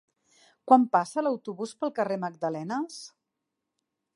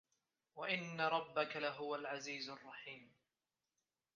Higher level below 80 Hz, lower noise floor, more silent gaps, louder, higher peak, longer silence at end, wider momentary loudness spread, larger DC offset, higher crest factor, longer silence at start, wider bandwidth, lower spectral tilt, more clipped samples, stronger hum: about the same, -86 dBFS vs under -90 dBFS; second, -84 dBFS vs under -90 dBFS; neither; first, -27 LUFS vs -42 LUFS; first, -6 dBFS vs -22 dBFS; about the same, 1.1 s vs 1.1 s; first, 19 LU vs 14 LU; neither; about the same, 24 dB vs 22 dB; about the same, 0.65 s vs 0.55 s; first, 11.5 kHz vs 7.2 kHz; first, -6 dB/octave vs -1.5 dB/octave; neither; neither